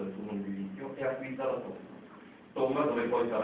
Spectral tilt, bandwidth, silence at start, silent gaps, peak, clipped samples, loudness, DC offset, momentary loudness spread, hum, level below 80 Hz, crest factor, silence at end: -5.5 dB/octave; 4 kHz; 0 s; none; -16 dBFS; under 0.1%; -34 LUFS; under 0.1%; 20 LU; none; -70 dBFS; 18 dB; 0 s